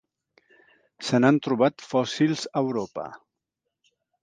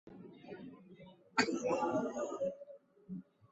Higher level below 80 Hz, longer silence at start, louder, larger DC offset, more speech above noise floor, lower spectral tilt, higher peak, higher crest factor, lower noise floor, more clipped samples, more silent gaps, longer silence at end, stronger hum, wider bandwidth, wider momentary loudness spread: first, -72 dBFS vs -78 dBFS; first, 1 s vs 0.05 s; first, -24 LUFS vs -37 LUFS; neither; first, 60 dB vs 23 dB; first, -6 dB/octave vs -3 dB/octave; first, -4 dBFS vs -16 dBFS; about the same, 22 dB vs 24 dB; first, -83 dBFS vs -58 dBFS; neither; neither; first, 1.05 s vs 0.3 s; neither; first, 9.6 kHz vs 8 kHz; second, 14 LU vs 22 LU